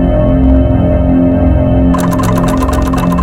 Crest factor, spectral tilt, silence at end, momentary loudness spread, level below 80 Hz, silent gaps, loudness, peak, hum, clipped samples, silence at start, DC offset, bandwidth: 8 dB; -8 dB/octave; 0 s; 3 LU; -14 dBFS; none; -10 LUFS; 0 dBFS; none; 0.2%; 0 s; under 0.1%; 16 kHz